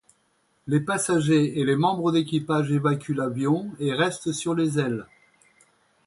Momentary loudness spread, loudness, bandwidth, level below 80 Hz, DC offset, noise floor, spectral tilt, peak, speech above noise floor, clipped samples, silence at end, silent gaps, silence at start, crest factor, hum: 6 LU; -24 LUFS; 11.5 kHz; -64 dBFS; under 0.1%; -68 dBFS; -5.5 dB/octave; -8 dBFS; 44 dB; under 0.1%; 1 s; none; 0.65 s; 16 dB; none